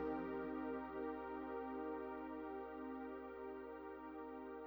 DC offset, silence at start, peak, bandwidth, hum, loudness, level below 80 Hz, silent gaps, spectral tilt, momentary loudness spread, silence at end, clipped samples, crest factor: under 0.1%; 0 s; -32 dBFS; over 20 kHz; none; -48 LUFS; -70 dBFS; none; -8.5 dB/octave; 6 LU; 0 s; under 0.1%; 14 dB